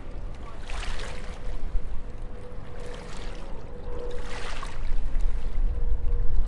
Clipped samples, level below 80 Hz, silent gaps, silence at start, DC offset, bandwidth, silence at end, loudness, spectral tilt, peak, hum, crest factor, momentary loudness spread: under 0.1%; -28 dBFS; none; 0 s; under 0.1%; 9 kHz; 0 s; -37 LUFS; -5.5 dB/octave; -8 dBFS; none; 14 dB; 10 LU